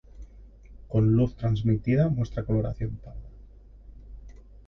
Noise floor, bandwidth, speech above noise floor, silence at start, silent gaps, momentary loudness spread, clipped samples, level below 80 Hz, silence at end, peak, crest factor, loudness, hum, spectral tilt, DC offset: -49 dBFS; 6.2 kHz; 24 dB; 0.15 s; none; 15 LU; under 0.1%; -42 dBFS; 0.35 s; -12 dBFS; 16 dB; -26 LUFS; none; -10 dB/octave; under 0.1%